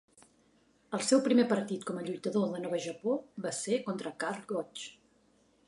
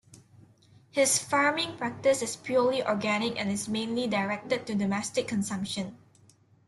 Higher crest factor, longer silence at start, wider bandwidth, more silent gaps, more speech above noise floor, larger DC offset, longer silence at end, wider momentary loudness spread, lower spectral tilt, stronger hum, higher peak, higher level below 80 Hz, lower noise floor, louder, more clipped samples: about the same, 20 dB vs 18 dB; first, 0.9 s vs 0.15 s; about the same, 11.5 kHz vs 12.5 kHz; neither; first, 36 dB vs 32 dB; neither; about the same, 0.75 s vs 0.7 s; first, 11 LU vs 8 LU; about the same, -4.5 dB/octave vs -3.5 dB/octave; neither; about the same, -14 dBFS vs -12 dBFS; second, -80 dBFS vs -68 dBFS; first, -68 dBFS vs -61 dBFS; second, -33 LUFS vs -28 LUFS; neither